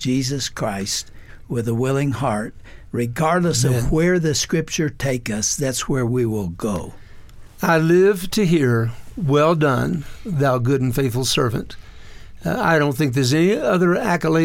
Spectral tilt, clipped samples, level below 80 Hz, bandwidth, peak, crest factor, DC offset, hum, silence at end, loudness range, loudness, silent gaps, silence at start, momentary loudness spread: -5 dB/octave; under 0.1%; -40 dBFS; 17 kHz; -6 dBFS; 14 dB; under 0.1%; none; 0 s; 4 LU; -20 LUFS; none; 0 s; 10 LU